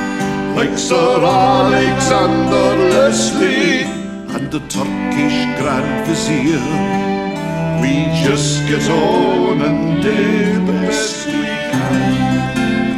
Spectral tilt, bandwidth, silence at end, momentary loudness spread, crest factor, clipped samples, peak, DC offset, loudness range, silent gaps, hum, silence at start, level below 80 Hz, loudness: -5 dB/octave; 15 kHz; 0 s; 7 LU; 14 dB; under 0.1%; 0 dBFS; under 0.1%; 4 LU; none; none; 0 s; -40 dBFS; -15 LUFS